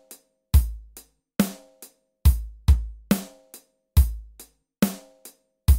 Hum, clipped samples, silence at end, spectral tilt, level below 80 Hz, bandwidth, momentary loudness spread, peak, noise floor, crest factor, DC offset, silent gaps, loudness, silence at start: none; under 0.1%; 0 s; -6 dB/octave; -26 dBFS; 16.5 kHz; 18 LU; -4 dBFS; -52 dBFS; 20 dB; under 0.1%; none; -25 LUFS; 0.55 s